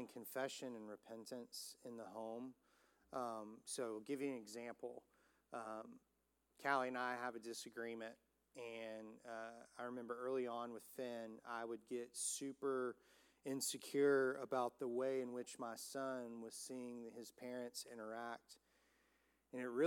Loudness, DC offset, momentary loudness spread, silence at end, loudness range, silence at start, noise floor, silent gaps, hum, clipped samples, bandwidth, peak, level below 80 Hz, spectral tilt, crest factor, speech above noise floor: -47 LUFS; under 0.1%; 13 LU; 0 s; 9 LU; 0 s; -84 dBFS; none; none; under 0.1%; 17.5 kHz; -24 dBFS; under -90 dBFS; -3 dB/octave; 22 dB; 38 dB